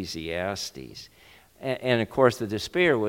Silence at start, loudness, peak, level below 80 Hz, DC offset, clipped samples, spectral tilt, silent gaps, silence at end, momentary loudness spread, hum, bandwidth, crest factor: 0 s; -26 LUFS; -6 dBFS; -56 dBFS; under 0.1%; under 0.1%; -5 dB/octave; none; 0 s; 17 LU; none; 17 kHz; 20 dB